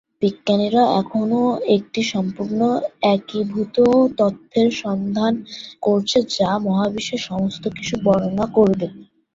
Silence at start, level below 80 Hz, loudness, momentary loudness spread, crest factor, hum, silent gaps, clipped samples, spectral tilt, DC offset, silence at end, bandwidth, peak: 0.2 s; -54 dBFS; -19 LUFS; 8 LU; 16 dB; none; none; under 0.1%; -6 dB/octave; under 0.1%; 0.3 s; 7.8 kHz; -2 dBFS